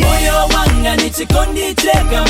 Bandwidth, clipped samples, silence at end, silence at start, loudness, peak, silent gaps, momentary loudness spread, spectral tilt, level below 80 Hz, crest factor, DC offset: 17 kHz; under 0.1%; 0 s; 0 s; -13 LUFS; 0 dBFS; none; 3 LU; -4 dB/octave; -16 dBFS; 12 dB; under 0.1%